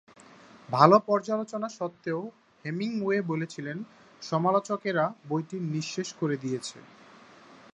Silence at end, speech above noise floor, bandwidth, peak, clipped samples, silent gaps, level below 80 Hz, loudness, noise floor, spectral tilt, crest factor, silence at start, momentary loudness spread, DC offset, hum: 0.2 s; 25 dB; 10.5 kHz; -2 dBFS; under 0.1%; none; -76 dBFS; -28 LUFS; -53 dBFS; -6 dB/octave; 26 dB; 0.7 s; 16 LU; under 0.1%; none